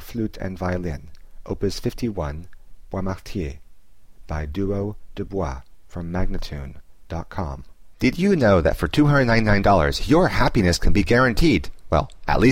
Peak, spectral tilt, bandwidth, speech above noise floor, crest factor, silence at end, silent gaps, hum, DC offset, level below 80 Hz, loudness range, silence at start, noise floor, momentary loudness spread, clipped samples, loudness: -6 dBFS; -6.5 dB/octave; 16 kHz; 29 dB; 16 dB; 0 s; none; none; 0.8%; -30 dBFS; 12 LU; 0 s; -49 dBFS; 16 LU; under 0.1%; -22 LUFS